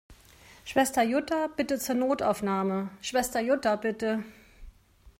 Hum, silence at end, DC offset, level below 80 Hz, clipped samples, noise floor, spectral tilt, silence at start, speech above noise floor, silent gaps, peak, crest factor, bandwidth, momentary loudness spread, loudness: none; 0.1 s; under 0.1%; -58 dBFS; under 0.1%; -55 dBFS; -4.5 dB/octave; 0.1 s; 27 dB; none; -12 dBFS; 18 dB; 16 kHz; 6 LU; -28 LUFS